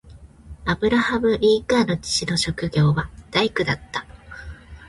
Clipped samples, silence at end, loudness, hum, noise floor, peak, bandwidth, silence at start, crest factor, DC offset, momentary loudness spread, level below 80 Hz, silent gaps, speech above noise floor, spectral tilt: under 0.1%; 0 s; -21 LUFS; none; -43 dBFS; -4 dBFS; 11.5 kHz; 0.05 s; 18 dB; under 0.1%; 19 LU; -42 dBFS; none; 22 dB; -5 dB/octave